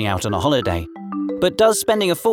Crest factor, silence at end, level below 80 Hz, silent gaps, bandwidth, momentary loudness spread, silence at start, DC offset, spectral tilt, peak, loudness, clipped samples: 16 dB; 0 s; -42 dBFS; none; over 20 kHz; 11 LU; 0 s; under 0.1%; -4.5 dB/octave; -2 dBFS; -19 LUFS; under 0.1%